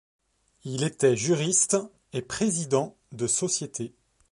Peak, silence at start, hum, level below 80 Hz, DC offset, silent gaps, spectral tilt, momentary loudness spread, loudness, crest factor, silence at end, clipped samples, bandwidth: -8 dBFS; 0.65 s; none; -64 dBFS; under 0.1%; none; -4 dB/octave; 14 LU; -26 LUFS; 20 dB; 0.45 s; under 0.1%; 11.5 kHz